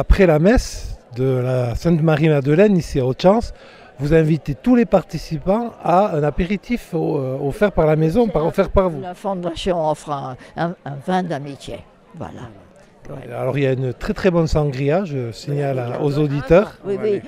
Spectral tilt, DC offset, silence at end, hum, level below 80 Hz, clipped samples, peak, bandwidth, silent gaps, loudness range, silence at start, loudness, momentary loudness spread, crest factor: -7.5 dB/octave; under 0.1%; 0 s; none; -32 dBFS; under 0.1%; 0 dBFS; 15 kHz; none; 8 LU; 0 s; -19 LUFS; 16 LU; 18 dB